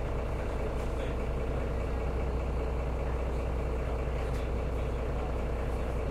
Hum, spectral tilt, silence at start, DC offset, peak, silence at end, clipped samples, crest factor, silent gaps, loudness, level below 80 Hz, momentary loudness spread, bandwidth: none; -7.5 dB/octave; 0 s; under 0.1%; -20 dBFS; 0 s; under 0.1%; 10 dB; none; -34 LUFS; -34 dBFS; 1 LU; 10.5 kHz